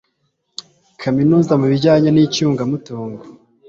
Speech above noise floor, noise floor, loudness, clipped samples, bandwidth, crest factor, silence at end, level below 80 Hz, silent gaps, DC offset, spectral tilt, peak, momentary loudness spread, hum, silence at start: 53 dB; -68 dBFS; -15 LUFS; under 0.1%; 7.6 kHz; 14 dB; 0.35 s; -54 dBFS; none; under 0.1%; -7 dB/octave; -2 dBFS; 21 LU; none; 1 s